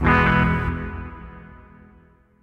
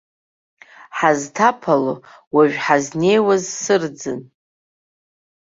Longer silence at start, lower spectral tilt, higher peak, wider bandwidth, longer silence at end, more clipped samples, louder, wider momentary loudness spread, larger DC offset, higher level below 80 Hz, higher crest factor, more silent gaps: second, 0 s vs 0.8 s; first, -8 dB/octave vs -4.5 dB/octave; about the same, -4 dBFS vs -2 dBFS; second, 6.6 kHz vs 7.8 kHz; second, 0.85 s vs 1.25 s; neither; about the same, -20 LUFS vs -18 LUFS; first, 25 LU vs 13 LU; neither; first, -32 dBFS vs -64 dBFS; about the same, 18 dB vs 18 dB; second, none vs 2.27-2.31 s